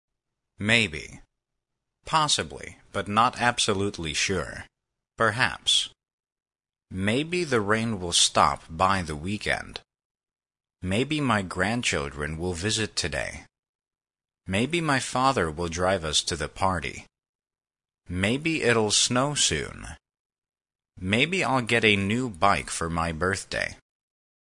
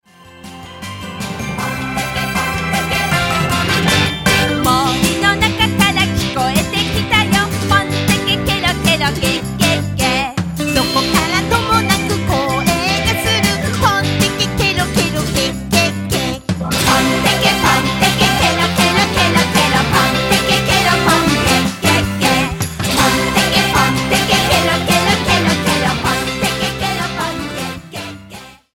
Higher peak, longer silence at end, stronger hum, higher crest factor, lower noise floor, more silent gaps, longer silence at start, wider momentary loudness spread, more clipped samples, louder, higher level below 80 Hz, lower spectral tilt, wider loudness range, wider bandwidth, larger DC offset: second, -4 dBFS vs 0 dBFS; first, 0.7 s vs 0.2 s; neither; first, 24 dB vs 16 dB; first, under -90 dBFS vs -37 dBFS; first, 6.13-6.18 s, 10.05-10.15 s, 13.59-13.63 s, 13.69-13.79 s, 17.29-17.39 s, 20.19-20.30 s vs none; first, 0.6 s vs 0.3 s; first, 14 LU vs 8 LU; neither; second, -25 LUFS vs -14 LUFS; second, -50 dBFS vs -32 dBFS; about the same, -3 dB/octave vs -3.5 dB/octave; about the same, 4 LU vs 3 LU; second, 11 kHz vs 17.5 kHz; neither